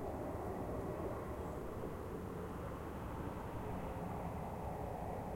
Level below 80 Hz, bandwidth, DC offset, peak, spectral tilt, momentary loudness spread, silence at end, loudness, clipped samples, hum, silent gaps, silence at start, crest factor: -54 dBFS; 16.5 kHz; under 0.1%; -32 dBFS; -7.5 dB/octave; 3 LU; 0 s; -45 LUFS; under 0.1%; none; none; 0 s; 12 dB